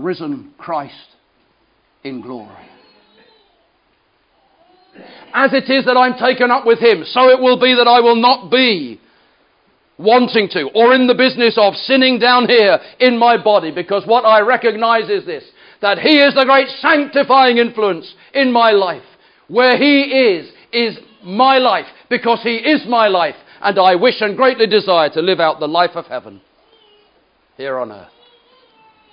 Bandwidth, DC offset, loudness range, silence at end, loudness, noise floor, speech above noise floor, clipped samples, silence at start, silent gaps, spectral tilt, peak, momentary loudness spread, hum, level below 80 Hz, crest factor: 5.4 kHz; under 0.1%; 8 LU; 1.15 s; -13 LUFS; -59 dBFS; 46 dB; under 0.1%; 0 s; none; -7 dB/octave; 0 dBFS; 14 LU; none; -70 dBFS; 14 dB